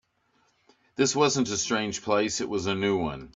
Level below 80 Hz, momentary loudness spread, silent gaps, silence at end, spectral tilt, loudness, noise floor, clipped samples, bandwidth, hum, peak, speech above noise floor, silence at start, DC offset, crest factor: -58 dBFS; 6 LU; none; 0.1 s; -3.5 dB/octave; -26 LUFS; -69 dBFS; under 0.1%; 8 kHz; none; -10 dBFS; 43 dB; 1 s; under 0.1%; 18 dB